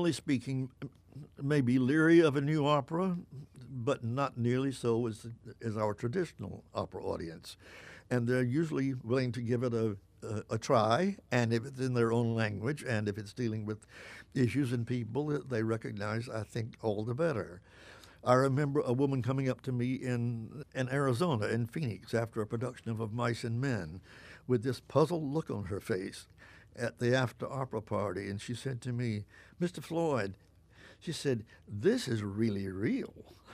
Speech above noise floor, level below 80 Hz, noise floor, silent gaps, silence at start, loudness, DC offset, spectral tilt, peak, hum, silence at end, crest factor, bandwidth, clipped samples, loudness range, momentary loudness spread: 25 dB; -64 dBFS; -58 dBFS; none; 0 s; -33 LUFS; under 0.1%; -7 dB/octave; -10 dBFS; none; 0 s; 22 dB; 14 kHz; under 0.1%; 6 LU; 15 LU